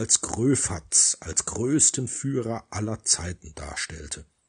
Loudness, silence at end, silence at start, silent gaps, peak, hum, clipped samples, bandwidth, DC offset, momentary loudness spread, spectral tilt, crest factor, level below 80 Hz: -23 LUFS; 0.25 s; 0 s; none; -6 dBFS; none; under 0.1%; 10.5 kHz; under 0.1%; 16 LU; -3 dB/octave; 20 dB; -50 dBFS